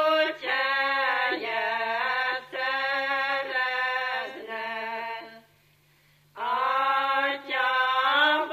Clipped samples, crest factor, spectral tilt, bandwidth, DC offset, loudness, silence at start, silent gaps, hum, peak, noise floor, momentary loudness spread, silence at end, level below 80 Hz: under 0.1%; 16 dB; -2.5 dB/octave; 15 kHz; under 0.1%; -26 LUFS; 0 s; none; 50 Hz at -75 dBFS; -10 dBFS; -62 dBFS; 10 LU; 0 s; -78 dBFS